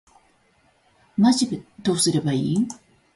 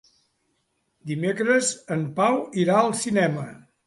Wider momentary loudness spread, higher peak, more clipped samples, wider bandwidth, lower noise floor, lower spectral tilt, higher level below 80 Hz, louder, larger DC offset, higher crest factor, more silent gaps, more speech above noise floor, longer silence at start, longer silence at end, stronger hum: about the same, 11 LU vs 12 LU; about the same, -6 dBFS vs -6 dBFS; neither; about the same, 11.5 kHz vs 11.5 kHz; second, -62 dBFS vs -72 dBFS; about the same, -5 dB/octave vs -5 dB/octave; first, -60 dBFS vs -66 dBFS; about the same, -22 LUFS vs -23 LUFS; neither; about the same, 18 dB vs 20 dB; neither; second, 41 dB vs 50 dB; first, 1.2 s vs 1.05 s; about the same, 0.4 s vs 0.3 s; neither